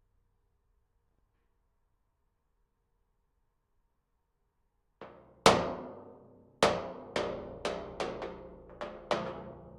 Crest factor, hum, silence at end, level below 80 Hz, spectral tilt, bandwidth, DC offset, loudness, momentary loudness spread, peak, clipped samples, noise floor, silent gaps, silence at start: 32 dB; none; 0 s; -60 dBFS; -3.5 dB/octave; 12 kHz; under 0.1%; -32 LUFS; 25 LU; -4 dBFS; under 0.1%; -78 dBFS; none; 5 s